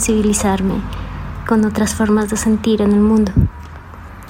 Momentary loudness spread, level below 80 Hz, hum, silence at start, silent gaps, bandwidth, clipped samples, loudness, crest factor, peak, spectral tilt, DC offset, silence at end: 16 LU; -30 dBFS; none; 0 s; none; 16.5 kHz; under 0.1%; -15 LUFS; 14 dB; 0 dBFS; -5.5 dB/octave; under 0.1%; 0 s